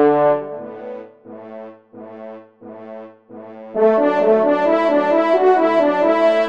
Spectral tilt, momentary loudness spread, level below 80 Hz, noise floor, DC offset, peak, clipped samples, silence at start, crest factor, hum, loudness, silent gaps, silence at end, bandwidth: -7 dB/octave; 23 LU; -70 dBFS; -38 dBFS; under 0.1%; -4 dBFS; under 0.1%; 0 s; 14 dB; none; -15 LUFS; none; 0 s; 7.6 kHz